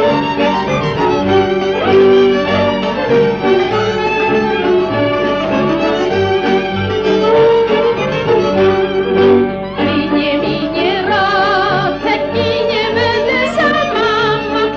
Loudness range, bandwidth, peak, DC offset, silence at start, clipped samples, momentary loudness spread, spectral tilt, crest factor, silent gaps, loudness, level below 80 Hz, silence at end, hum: 2 LU; 7.8 kHz; 0 dBFS; under 0.1%; 0 s; under 0.1%; 5 LU; -6 dB/octave; 12 dB; none; -13 LUFS; -40 dBFS; 0 s; 50 Hz at -35 dBFS